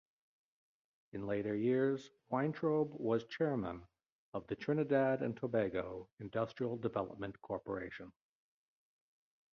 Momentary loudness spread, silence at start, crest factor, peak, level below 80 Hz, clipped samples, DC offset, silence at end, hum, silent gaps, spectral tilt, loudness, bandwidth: 14 LU; 1.15 s; 20 dB; -20 dBFS; -70 dBFS; under 0.1%; under 0.1%; 1.4 s; none; 4.12-4.32 s, 6.12-6.17 s; -6.5 dB/octave; -38 LUFS; 7 kHz